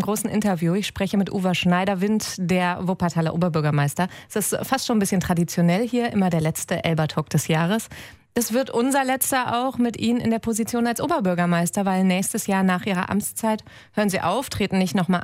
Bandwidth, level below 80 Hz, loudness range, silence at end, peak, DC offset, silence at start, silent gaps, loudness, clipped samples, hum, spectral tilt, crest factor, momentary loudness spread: 16 kHz; -52 dBFS; 1 LU; 0 s; -6 dBFS; under 0.1%; 0 s; none; -22 LUFS; under 0.1%; none; -5 dB/octave; 16 dB; 4 LU